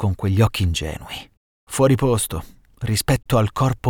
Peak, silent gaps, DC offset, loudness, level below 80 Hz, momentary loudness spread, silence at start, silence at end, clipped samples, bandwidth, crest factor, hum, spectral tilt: -4 dBFS; 1.37-1.67 s; under 0.1%; -20 LUFS; -36 dBFS; 14 LU; 0 s; 0 s; under 0.1%; 18.5 kHz; 16 dB; none; -5.5 dB/octave